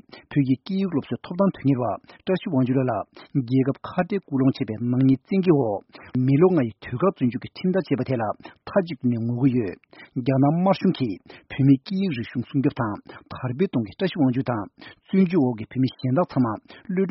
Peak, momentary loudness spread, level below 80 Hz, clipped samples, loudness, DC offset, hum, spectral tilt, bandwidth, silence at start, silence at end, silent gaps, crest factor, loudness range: -6 dBFS; 11 LU; -60 dBFS; under 0.1%; -23 LUFS; under 0.1%; none; -7.5 dB/octave; 5.8 kHz; 0.15 s; 0 s; none; 18 dB; 3 LU